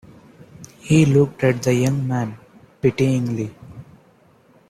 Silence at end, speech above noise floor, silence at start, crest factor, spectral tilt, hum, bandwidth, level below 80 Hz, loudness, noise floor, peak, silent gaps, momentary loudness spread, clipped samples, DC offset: 0.85 s; 36 dB; 0.6 s; 18 dB; -7 dB/octave; none; 14.5 kHz; -52 dBFS; -19 LUFS; -54 dBFS; -4 dBFS; none; 16 LU; under 0.1%; under 0.1%